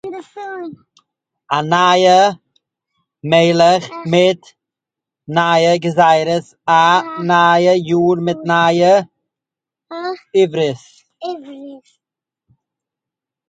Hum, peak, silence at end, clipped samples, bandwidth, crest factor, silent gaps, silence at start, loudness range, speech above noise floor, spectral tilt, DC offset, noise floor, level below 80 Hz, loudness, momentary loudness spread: none; 0 dBFS; 1.7 s; under 0.1%; 9.2 kHz; 16 dB; none; 0.05 s; 9 LU; 72 dB; -5 dB/octave; under 0.1%; -86 dBFS; -64 dBFS; -13 LUFS; 19 LU